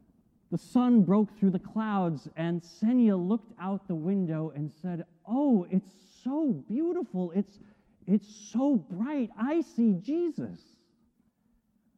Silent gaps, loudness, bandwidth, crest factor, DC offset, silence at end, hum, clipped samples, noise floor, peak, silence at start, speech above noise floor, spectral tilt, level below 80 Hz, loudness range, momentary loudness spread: none; -29 LUFS; 8.6 kHz; 16 dB; under 0.1%; 1.4 s; none; under 0.1%; -71 dBFS; -14 dBFS; 0.5 s; 42 dB; -8.5 dB/octave; -72 dBFS; 4 LU; 12 LU